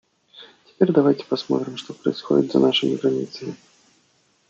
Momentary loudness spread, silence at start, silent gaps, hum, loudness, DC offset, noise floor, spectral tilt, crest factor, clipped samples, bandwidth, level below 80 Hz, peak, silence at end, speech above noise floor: 14 LU; 0.35 s; none; none; -21 LUFS; under 0.1%; -63 dBFS; -6.5 dB/octave; 20 dB; under 0.1%; 7.8 kHz; -72 dBFS; -2 dBFS; 0.95 s; 42 dB